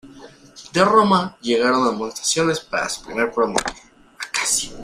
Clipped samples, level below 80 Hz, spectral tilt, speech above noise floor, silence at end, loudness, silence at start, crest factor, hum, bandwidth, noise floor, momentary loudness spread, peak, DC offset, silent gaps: under 0.1%; -52 dBFS; -3 dB/octave; 24 dB; 0 s; -19 LUFS; 0.05 s; 18 dB; none; 15.5 kHz; -44 dBFS; 10 LU; -2 dBFS; under 0.1%; none